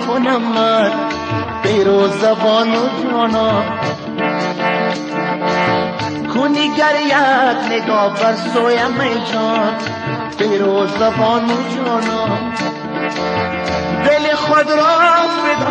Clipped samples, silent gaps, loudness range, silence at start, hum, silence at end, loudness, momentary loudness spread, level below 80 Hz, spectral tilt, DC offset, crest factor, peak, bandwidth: under 0.1%; none; 3 LU; 0 s; none; 0 s; -15 LUFS; 7 LU; -48 dBFS; -5 dB/octave; under 0.1%; 14 dB; -2 dBFS; 9.8 kHz